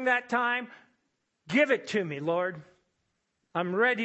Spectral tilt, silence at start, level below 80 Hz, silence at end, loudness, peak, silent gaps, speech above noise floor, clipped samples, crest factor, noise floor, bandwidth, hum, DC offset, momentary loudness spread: -5.5 dB/octave; 0 s; -78 dBFS; 0 s; -28 LUFS; -10 dBFS; none; 50 dB; under 0.1%; 20 dB; -78 dBFS; 8.4 kHz; none; under 0.1%; 11 LU